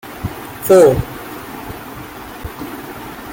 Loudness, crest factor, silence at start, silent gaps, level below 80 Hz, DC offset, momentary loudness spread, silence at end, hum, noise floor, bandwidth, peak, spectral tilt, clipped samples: -13 LUFS; 16 dB; 0.05 s; none; -38 dBFS; under 0.1%; 21 LU; 0 s; none; -31 dBFS; 17 kHz; -2 dBFS; -6 dB/octave; under 0.1%